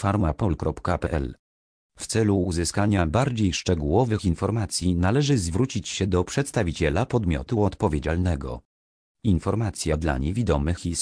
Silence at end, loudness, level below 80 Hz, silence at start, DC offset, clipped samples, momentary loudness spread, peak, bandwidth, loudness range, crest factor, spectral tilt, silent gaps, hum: 0 s; -24 LUFS; -36 dBFS; 0 s; under 0.1%; under 0.1%; 5 LU; -8 dBFS; 11 kHz; 3 LU; 16 dB; -6 dB/octave; 1.39-1.89 s, 8.65-9.15 s; none